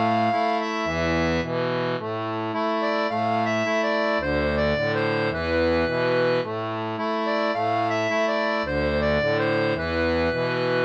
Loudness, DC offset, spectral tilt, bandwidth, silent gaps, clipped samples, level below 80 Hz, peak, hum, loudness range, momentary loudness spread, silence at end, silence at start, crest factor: -24 LUFS; under 0.1%; -6 dB/octave; 8.2 kHz; none; under 0.1%; -42 dBFS; -10 dBFS; none; 1 LU; 4 LU; 0 s; 0 s; 12 dB